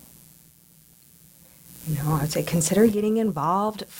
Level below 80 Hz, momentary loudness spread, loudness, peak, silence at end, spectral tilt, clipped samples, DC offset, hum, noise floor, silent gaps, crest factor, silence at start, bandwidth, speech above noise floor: -52 dBFS; 9 LU; -23 LUFS; -6 dBFS; 0 s; -5.5 dB/octave; under 0.1%; under 0.1%; none; -55 dBFS; none; 18 dB; 1.7 s; 17 kHz; 32 dB